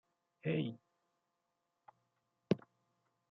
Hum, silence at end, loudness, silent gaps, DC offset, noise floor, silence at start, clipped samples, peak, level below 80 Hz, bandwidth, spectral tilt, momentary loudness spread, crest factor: none; 0.75 s; -40 LUFS; none; under 0.1%; -86 dBFS; 0.45 s; under 0.1%; -16 dBFS; -84 dBFS; 6.4 kHz; -7 dB/octave; 7 LU; 30 dB